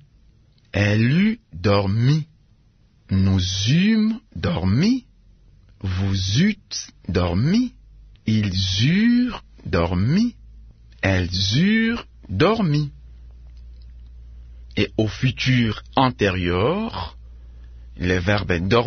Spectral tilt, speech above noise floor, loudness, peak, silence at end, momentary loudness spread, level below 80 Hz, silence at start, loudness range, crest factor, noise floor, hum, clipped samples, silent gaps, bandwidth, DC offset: -6 dB/octave; 36 dB; -21 LUFS; -2 dBFS; 0 s; 11 LU; -42 dBFS; 0.75 s; 3 LU; 18 dB; -56 dBFS; none; under 0.1%; none; 6.6 kHz; under 0.1%